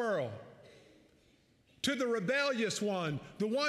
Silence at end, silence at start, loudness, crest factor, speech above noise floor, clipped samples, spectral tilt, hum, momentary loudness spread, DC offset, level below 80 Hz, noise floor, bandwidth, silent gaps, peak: 0 s; 0 s; -34 LUFS; 16 dB; 35 dB; under 0.1%; -4 dB/octave; none; 10 LU; under 0.1%; -74 dBFS; -68 dBFS; 15 kHz; none; -20 dBFS